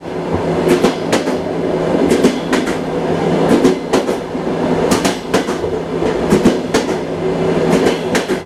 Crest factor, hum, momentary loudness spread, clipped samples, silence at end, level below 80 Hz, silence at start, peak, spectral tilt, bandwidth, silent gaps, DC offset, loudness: 14 dB; none; 6 LU; under 0.1%; 0 s; -40 dBFS; 0 s; 0 dBFS; -5.5 dB/octave; 15 kHz; none; under 0.1%; -15 LUFS